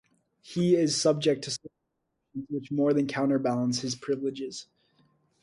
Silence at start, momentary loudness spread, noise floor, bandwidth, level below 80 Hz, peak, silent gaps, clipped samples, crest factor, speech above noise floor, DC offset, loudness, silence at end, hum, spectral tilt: 0.45 s; 14 LU; -80 dBFS; 11.5 kHz; -70 dBFS; -12 dBFS; none; under 0.1%; 18 dB; 53 dB; under 0.1%; -28 LUFS; 0.8 s; none; -5 dB/octave